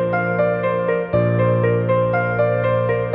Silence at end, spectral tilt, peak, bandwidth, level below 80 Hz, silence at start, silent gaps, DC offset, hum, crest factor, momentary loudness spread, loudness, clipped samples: 0 s; -11.5 dB/octave; -6 dBFS; 4.5 kHz; -46 dBFS; 0 s; none; under 0.1%; none; 12 dB; 2 LU; -18 LUFS; under 0.1%